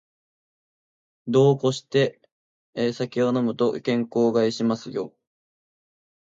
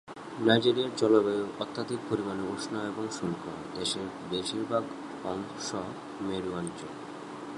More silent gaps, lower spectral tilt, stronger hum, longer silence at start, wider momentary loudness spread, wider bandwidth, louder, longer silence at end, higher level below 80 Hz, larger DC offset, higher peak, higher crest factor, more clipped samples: first, 2.32-2.73 s vs none; first, -6.5 dB/octave vs -4.5 dB/octave; neither; first, 1.25 s vs 0.05 s; about the same, 13 LU vs 15 LU; second, 7.8 kHz vs 11.5 kHz; first, -23 LUFS vs -31 LUFS; first, 1.1 s vs 0 s; second, -70 dBFS vs -64 dBFS; neither; about the same, -6 dBFS vs -8 dBFS; second, 18 dB vs 24 dB; neither